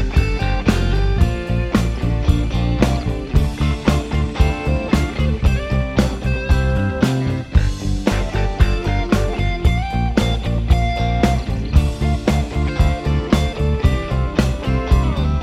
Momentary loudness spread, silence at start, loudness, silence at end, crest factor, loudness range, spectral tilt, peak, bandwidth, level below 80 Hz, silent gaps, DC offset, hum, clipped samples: 3 LU; 0 s; -19 LUFS; 0 s; 16 dB; 1 LU; -7 dB/octave; 0 dBFS; 13 kHz; -20 dBFS; none; under 0.1%; none; under 0.1%